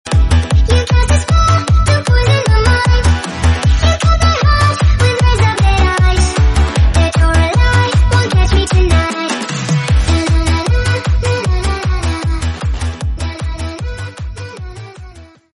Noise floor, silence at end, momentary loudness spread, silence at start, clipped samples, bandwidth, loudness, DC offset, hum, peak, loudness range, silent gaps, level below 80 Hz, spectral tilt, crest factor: -36 dBFS; 0.3 s; 11 LU; 0.05 s; under 0.1%; 11.5 kHz; -13 LUFS; under 0.1%; none; 0 dBFS; 7 LU; none; -14 dBFS; -5 dB/octave; 10 dB